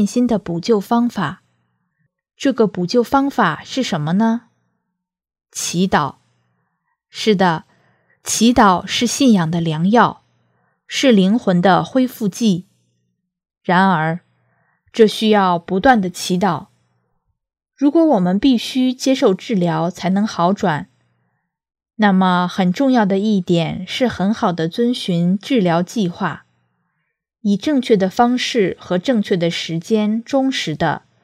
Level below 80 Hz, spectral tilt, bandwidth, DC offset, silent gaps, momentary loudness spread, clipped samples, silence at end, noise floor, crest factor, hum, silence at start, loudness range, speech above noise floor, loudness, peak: -52 dBFS; -5.5 dB/octave; 16 kHz; under 0.1%; none; 8 LU; under 0.1%; 0.25 s; -76 dBFS; 18 dB; none; 0 s; 4 LU; 60 dB; -17 LUFS; 0 dBFS